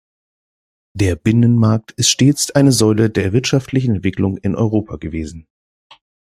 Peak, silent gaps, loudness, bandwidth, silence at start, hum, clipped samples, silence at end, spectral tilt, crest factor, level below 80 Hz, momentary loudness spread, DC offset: 0 dBFS; none; -15 LUFS; 15 kHz; 0.95 s; none; under 0.1%; 0.8 s; -5 dB/octave; 16 dB; -44 dBFS; 13 LU; under 0.1%